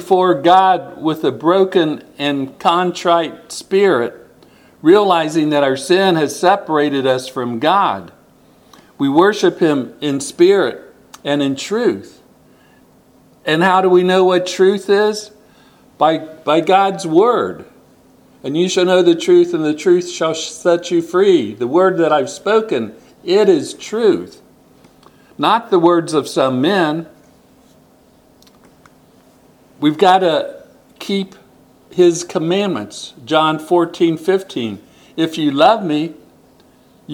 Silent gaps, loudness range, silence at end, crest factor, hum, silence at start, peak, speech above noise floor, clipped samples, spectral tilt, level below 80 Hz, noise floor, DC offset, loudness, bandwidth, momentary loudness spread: none; 4 LU; 0 s; 16 dB; none; 0 s; 0 dBFS; 35 dB; under 0.1%; -5 dB/octave; -62 dBFS; -50 dBFS; under 0.1%; -15 LUFS; 14.5 kHz; 12 LU